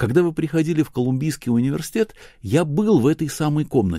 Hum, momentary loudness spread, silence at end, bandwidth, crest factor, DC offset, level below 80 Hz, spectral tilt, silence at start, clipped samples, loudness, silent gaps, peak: none; 6 LU; 0 s; 16 kHz; 16 dB; under 0.1%; -48 dBFS; -7 dB/octave; 0 s; under 0.1%; -21 LUFS; none; -4 dBFS